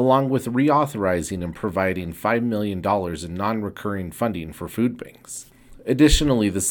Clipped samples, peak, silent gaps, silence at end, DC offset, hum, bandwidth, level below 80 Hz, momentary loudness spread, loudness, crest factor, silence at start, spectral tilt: under 0.1%; -4 dBFS; none; 0 s; under 0.1%; none; 19 kHz; -34 dBFS; 13 LU; -22 LUFS; 18 dB; 0 s; -5 dB/octave